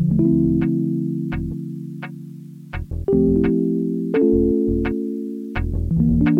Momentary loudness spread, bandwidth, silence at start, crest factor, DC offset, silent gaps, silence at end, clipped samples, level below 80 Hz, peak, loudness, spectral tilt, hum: 16 LU; 4.6 kHz; 0 s; 14 dB; under 0.1%; none; 0 s; under 0.1%; -32 dBFS; -6 dBFS; -20 LUFS; -10.5 dB/octave; none